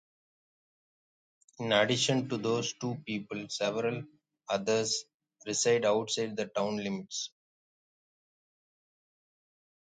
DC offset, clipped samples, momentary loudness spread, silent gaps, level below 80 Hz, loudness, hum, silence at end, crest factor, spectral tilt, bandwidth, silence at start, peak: under 0.1%; under 0.1%; 12 LU; 5.14-5.20 s; -76 dBFS; -31 LUFS; none; 2.55 s; 24 dB; -3.5 dB/octave; 9.6 kHz; 1.6 s; -10 dBFS